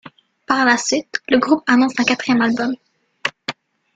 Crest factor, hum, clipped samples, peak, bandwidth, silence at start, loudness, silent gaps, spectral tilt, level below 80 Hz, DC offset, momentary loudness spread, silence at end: 16 dB; none; under 0.1%; -2 dBFS; 9.2 kHz; 0.05 s; -17 LUFS; none; -3 dB/octave; -60 dBFS; under 0.1%; 11 LU; 0.45 s